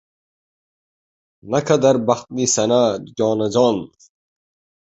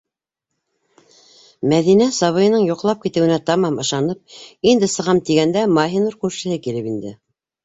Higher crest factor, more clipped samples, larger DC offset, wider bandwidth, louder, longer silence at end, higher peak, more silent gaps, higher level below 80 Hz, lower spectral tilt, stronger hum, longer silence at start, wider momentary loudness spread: about the same, 18 dB vs 16 dB; neither; neither; about the same, 8.2 kHz vs 8 kHz; about the same, -18 LUFS vs -17 LUFS; first, 1 s vs 0.5 s; about the same, -2 dBFS vs -2 dBFS; neither; about the same, -60 dBFS vs -56 dBFS; about the same, -4.5 dB/octave vs -5 dB/octave; neither; second, 1.45 s vs 1.6 s; second, 7 LU vs 10 LU